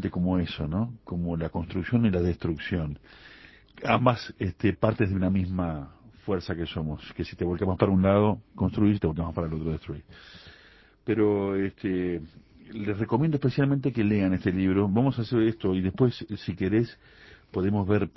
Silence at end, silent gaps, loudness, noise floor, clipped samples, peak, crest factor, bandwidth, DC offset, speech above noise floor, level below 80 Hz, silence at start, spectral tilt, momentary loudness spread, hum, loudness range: 0.05 s; none; -27 LUFS; -56 dBFS; under 0.1%; -4 dBFS; 22 dB; 6 kHz; under 0.1%; 30 dB; -44 dBFS; 0 s; -9.5 dB/octave; 11 LU; none; 4 LU